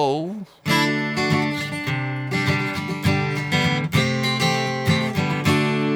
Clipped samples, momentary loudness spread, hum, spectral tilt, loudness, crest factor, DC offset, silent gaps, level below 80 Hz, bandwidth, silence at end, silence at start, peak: under 0.1%; 5 LU; none; -5 dB/octave; -21 LUFS; 16 dB; under 0.1%; none; -52 dBFS; 19.5 kHz; 0 s; 0 s; -6 dBFS